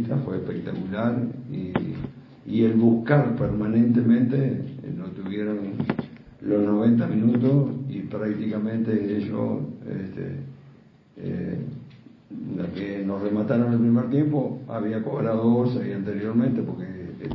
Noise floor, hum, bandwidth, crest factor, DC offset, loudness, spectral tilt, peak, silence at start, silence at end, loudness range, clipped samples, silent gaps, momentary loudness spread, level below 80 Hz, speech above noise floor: -51 dBFS; none; 5.2 kHz; 18 dB; under 0.1%; -24 LUFS; -11.5 dB/octave; -6 dBFS; 0 s; 0 s; 9 LU; under 0.1%; none; 14 LU; -54 dBFS; 29 dB